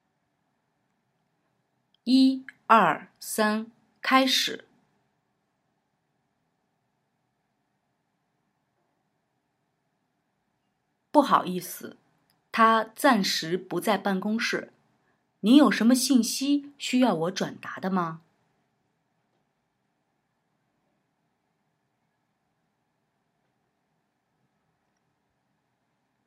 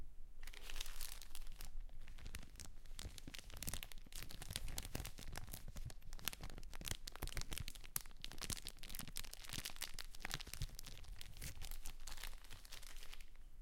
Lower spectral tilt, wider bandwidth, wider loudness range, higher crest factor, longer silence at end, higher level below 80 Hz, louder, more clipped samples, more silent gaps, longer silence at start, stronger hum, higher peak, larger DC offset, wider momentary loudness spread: first, -4 dB/octave vs -2 dB/octave; about the same, 16 kHz vs 17 kHz; first, 8 LU vs 5 LU; second, 26 dB vs 32 dB; first, 8.1 s vs 0 s; second, -86 dBFS vs -52 dBFS; first, -24 LUFS vs -51 LUFS; neither; neither; first, 2.05 s vs 0 s; neither; first, -4 dBFS vs -16 dBFS; neither; first, 13 LU vs 10 LU